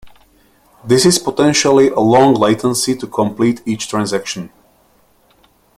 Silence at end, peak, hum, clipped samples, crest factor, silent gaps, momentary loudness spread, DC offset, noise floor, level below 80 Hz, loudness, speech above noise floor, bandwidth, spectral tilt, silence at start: 1.3 s; 0 dBFS; none; under 0.1%; 16 dB; none; 10 LU; under 0.1%; -54 dBFS; -52 dBFS; -14 LUFS; 41 dB; 16 kHz; -4.5 dB/octave; 0.05 s